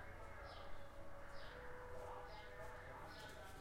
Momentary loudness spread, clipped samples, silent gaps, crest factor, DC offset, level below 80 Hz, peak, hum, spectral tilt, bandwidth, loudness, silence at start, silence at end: 4 LU; under 0.1%; none; 14 dB; under 0.1%; -60 dBFS; -38 dBFS; none; -4.5 dB/octave; 16 kHz; -55 LUFS; 0 s; 0 s